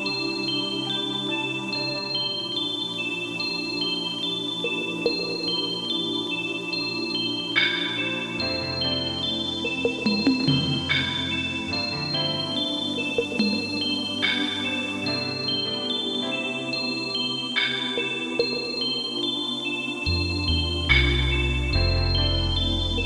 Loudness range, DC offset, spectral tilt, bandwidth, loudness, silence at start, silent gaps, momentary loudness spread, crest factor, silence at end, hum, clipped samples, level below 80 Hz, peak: 3 LU; under 0.1%; -4.5 dB/octave; 12 kHz; -24 LUFS; 0 s; none; 4 LU; 20 dB; 0 s; none; under 0.1%; -38 dBFS; -6 dBFS